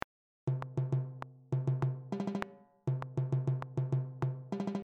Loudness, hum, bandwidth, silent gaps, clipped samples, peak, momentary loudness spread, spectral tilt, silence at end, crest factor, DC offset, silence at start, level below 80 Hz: -37 LUFS; none; 6.6 kHz; none; under 0.1%; -14 dBFS; 8 LU; -9 dB/octave; 0 s; 22 dB; under 0.1%; 0.45 s; -68 dBFS